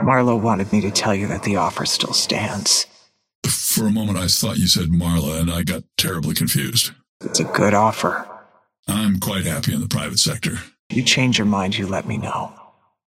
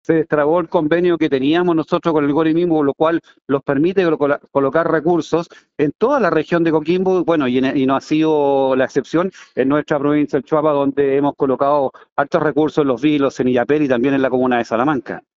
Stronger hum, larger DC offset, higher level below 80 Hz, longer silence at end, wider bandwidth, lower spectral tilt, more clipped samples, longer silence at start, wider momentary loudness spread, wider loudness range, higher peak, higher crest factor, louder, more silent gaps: neither; neither; first, -44 dBFS vs -54 dBFS; first, 0.45 s vs 0.15 s; first, 16.5 kHz vs 7.6 kHz; second, -3.5 dB/octave vs -5.5 dB/octave; neither; about the same, 0 s vs 0.1 s; first, 9 LU vs 4 LU; about the same, 2 LU vs 1 LU; about the same, -2 dBFS vs 0 dBFS; about the same, 18 dB vs 16 dB; about the same, -19 LUFS vs -17 LUFS; first, 3.35-3.42 s, 7.09-7.20 s, 8.79-8.83 s, 10.79-10.90 s vs 5.95-5.99 s, 12.12-12.16 s